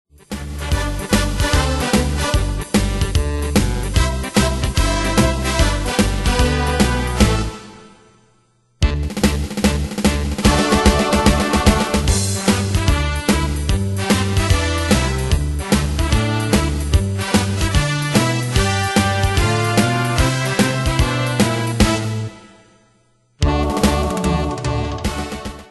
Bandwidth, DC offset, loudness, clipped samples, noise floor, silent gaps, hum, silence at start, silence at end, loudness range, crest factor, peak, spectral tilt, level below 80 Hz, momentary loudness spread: 12.5 kHz; under 0.1%; -18 LUFS; under 0.1%; -58 dBFS; none; none; 0.3 s; 0.05 s; 4 LU; 18 dB; 0 dBFS; -5 dB/octave; -22 dBFS; 6 LU